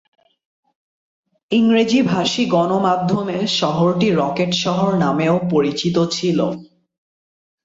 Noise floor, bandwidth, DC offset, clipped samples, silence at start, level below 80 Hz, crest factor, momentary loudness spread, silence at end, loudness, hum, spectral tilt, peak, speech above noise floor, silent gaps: under -90 dBFS; 7.8 kHz; under 0.1%; under 0.1%; 1.5 s; -56 dBFS; 14 dB; 5 LU; 1 s; -17 LUFS; none; -5.5 dB/octave; -4 dBFS; over 73 dB; none